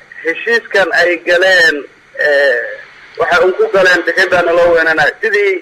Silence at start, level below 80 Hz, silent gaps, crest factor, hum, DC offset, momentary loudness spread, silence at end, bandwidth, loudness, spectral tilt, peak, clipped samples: 0.15 s; -48 dBFS; none; 10 dB; none; under 0.1%; 9 LU; 0 s; 15.5 kHz; -11 LUFS; -3 dB/octave; -2 dBFS; under 0.1%